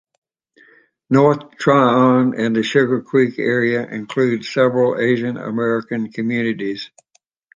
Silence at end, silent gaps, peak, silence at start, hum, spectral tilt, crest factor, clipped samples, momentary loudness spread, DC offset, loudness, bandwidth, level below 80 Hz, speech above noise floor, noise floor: 0.7 s; none; -2 dBFS; 1.1 s; none; -7 dB/octave; 16 dB; under 0.1%; 10 LU; under 0.1%; -17 LUFS; 7.6 kHz; -64 dBFS; 46 dB; -63 dBFS